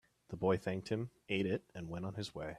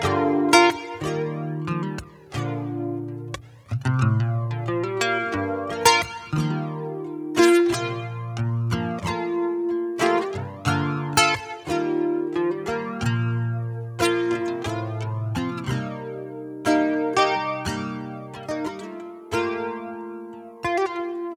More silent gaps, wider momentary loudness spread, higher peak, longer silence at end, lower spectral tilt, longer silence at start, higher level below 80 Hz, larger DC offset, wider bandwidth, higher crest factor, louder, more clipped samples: neither; second, 9 LU vs 14 LU; second, -20 dBFS vs -2 dBFS; about the same, 0 s vs 0 s; first, -6.5 dB/octave vs -5 dB/octave; first, 0.3 s vs 0 s; second, -66 dBFS vs -52 dBFS; neither; second, 13 kHz vs over 20 kHz; about the same, 20 dB vs 22 dB; second, -39 LUFS vs -24 LUFS; neither